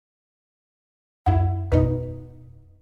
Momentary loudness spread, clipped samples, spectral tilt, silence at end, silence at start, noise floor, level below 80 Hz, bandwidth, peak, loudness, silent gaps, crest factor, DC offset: 13 LU; under 0.1%; -10 dB/octave; 0.4 s; 1.25 s; -46 dBFS; -36 dBFS; 4.7 kHz; -6 dBFS; -23 LUFS; none; 20 dB; under 0.1%